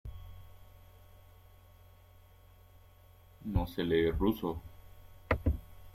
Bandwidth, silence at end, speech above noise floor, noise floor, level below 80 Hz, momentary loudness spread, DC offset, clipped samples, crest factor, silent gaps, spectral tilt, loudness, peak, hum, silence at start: 16 kHz; 0.05 s; 27 dB; -59 dBFS; -46 dBFS; 24 LU; under 0.1%; under 0.1%; 26 dB; none; -8 dB/octave; -34 LUFS; -12 dBFS; none; 0.05 s